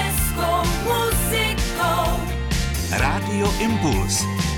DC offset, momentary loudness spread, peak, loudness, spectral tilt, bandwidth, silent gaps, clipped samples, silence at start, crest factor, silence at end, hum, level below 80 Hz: under 0.1%; 3 LU; -10 dBFS; -21 LUFS; -4 dB/octave; 19 kHz; none; under 0.1%; 0 s; 12 dB; 0 s; none; -28 dBFS